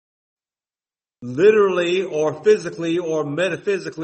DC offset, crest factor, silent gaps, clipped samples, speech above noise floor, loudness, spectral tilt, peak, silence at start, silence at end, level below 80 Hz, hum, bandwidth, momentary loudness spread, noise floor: under 0.1%; 18 dB; none; under 0.1%; over 71 dB; -19 LUFS; -5.5 dB/octave; -4 dBFS; 1.2 s; 0 s; -66 dBFS; none; 8.6 kHz; 9 LU; under -90 dBFS